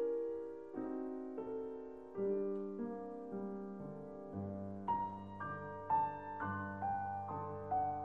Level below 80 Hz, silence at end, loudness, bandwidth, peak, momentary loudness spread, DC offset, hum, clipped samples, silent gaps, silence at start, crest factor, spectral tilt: -72 dBFS; 0 s; -42 LUFS; 5.2 kHz; -26 dBFS; 9 LU; under 0.1%; none; under 0.1%; none; 0 s; 16 dB; -9.5 dB/octave